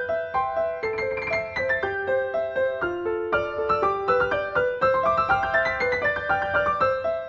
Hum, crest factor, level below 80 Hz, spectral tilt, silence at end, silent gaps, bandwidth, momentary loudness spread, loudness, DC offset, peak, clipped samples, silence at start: none; 14 dB; -50 dBFS; -6 dB/octave; 0 s; none; 7.4 kHz; 5 LU; -24 LUFS; under 0.1%; -10 dBFS; under 0.1%; 0 s